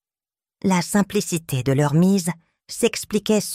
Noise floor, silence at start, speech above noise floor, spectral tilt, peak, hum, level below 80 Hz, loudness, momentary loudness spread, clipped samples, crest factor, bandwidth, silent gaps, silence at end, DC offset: under -90 dBFS; 0.65 s; over 70 dB; -5.5 dB/octave; -6 dBFS; none; -54 dBFS; -21 LUFS; 9 LU; under 0.1%; 16 dB; 16 kHz; none; 0 s; under 0.1%